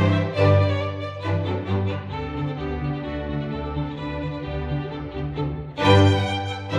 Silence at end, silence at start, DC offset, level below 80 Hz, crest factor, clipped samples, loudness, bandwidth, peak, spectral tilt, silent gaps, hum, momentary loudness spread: 0 s; 0 s; under 0.1%; -40 dBFS; 18 dB; under 0.1%; -24 LUFS; 8.4 kHz; -4 dBFS; -7 dB/octave; none; none; 11 LU